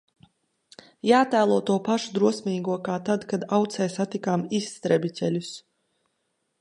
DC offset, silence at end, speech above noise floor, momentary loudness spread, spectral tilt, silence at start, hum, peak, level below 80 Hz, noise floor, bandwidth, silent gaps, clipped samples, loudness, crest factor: under 0.1%; 1 s; 51 dB; 8 LU; -5.5 dB/octave; 1.05 s; none; -6 dBFS; -72 dBFS; -75 dBFS; 11.5 kHz; none; under 0.1%; -25 LUFS; 20 dB